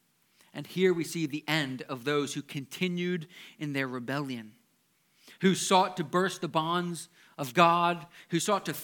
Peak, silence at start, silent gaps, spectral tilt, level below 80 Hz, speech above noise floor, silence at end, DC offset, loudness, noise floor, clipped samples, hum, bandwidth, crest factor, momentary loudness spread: -6 dBFS; 0.55 s; none; -4.5 dB/octave; -80 dBFS; 41 dB; 0 s; under 0.1%; -29 LUFS; -71 dBFS; under 0.1%; none; 19 kHz; 24 dB; 15 LU